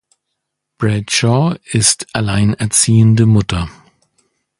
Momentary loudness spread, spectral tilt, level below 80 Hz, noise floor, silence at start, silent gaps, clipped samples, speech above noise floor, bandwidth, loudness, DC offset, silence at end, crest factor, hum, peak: 10 LU; -4.5 dB/octave; -36 dBFS; -75 dBFS; 0.8 s; none; under 0.1%; 62 dB; 11.5 kHz; -13 LUFS; under 0.1%; 0.9 s; 14 dB; none; 0 dBFS